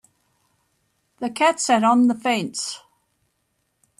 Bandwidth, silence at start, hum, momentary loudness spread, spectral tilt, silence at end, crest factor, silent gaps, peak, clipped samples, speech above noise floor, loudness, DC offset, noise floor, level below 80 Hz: 12.5 kHz; 1.2 s; none; 14 LU; -3.5 dB/octave; 1.2 s; 18 dB; none; -6 dBFS; under 0.1%; 52 dB; -20 LUFS; under 0.1%; -72 dBFS; -72 dBFS